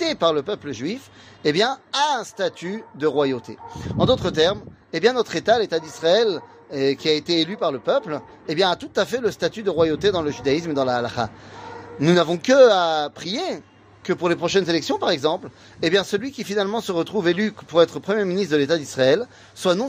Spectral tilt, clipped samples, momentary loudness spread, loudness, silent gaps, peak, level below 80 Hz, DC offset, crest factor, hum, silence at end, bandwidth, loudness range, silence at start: -5 dB/octave; under 0.1%; 12 LU; -21 LUFS; none; -2 dBFS; -54 dBFS; under 0.1%; 18 dB; none; 0 s; 15.5 kHz; 3 LU; 0 s